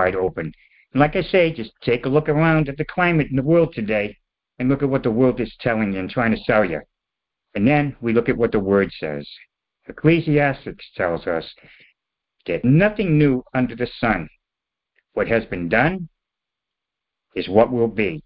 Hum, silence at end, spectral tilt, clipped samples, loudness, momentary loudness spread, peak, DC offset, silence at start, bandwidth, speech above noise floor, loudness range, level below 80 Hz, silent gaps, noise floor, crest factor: none; 0.05 s; -12 dB/octave; under 0.1%; -20 LUFS; 13 LU; -2 dBFS; under 0.1%; 0 s; 5.4 kHz; 66 dB; 4 LU; -44 dBFS; none; -85 dBFS; 18 dB